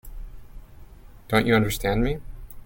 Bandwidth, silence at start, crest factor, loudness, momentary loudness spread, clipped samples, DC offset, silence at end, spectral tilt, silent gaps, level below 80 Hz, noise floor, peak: 17 kHz; 0.05 s; 22 dB; -23 LUFS; 24 LU; under 0.1%; under 0.1%; 0 s; -5.5 dB/octave; none; -36 dBFS; -45 dBFS; -4 dBFS